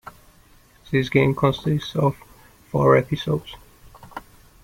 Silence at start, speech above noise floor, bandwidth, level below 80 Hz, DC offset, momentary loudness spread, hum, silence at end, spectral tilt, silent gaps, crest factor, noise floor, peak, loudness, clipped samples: 0.9 s; 33 dB; 16.5 kHz; -50 dBFS; under 0.1%; 22 LU; none; 0.45 s; -7.5 dB/octave; none; 20 dB; -53 dBFS; -4 dBFS; -21 LUFS; under 0.1%